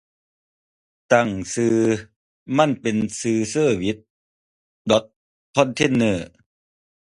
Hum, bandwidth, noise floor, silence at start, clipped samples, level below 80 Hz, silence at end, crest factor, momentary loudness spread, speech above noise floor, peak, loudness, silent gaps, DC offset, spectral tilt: none; 11.5 kHz; under -90 dBFS; 1.1 s; under 0.1%; -54 dBFS; 0.85 s; 22 dB; 8 LU; over 70 dB; -2 dBFS; -21 LUFS; 2.16-2.46 s, 4.10-4.85 s, 5.16-5.53 s; under 0.1%; -5 dB/octave